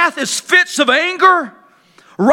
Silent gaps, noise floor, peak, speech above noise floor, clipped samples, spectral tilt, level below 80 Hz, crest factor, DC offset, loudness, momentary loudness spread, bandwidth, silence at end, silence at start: none; -48 dBFS; 0 dBFS; 35 dB; under 0.1%; -2.5 dB/octave; -64 dBFS; 14 dB; under 0.1%; -12 LUFS; 7 LU; 17.5 kHz; 0 s; 0 s